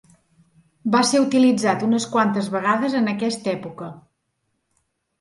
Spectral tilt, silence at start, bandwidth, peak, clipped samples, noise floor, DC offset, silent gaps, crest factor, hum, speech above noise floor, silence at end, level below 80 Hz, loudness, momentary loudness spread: -4.5 dB/octave; 0.85 s; 11.5 kHz; -4 dBFS; under 0.1%; -73 dBFS; under 0.1%; none; 16 dB; none; 54 dB; 1.2 s; -68 dBFS; -20 LUFS; 13 LU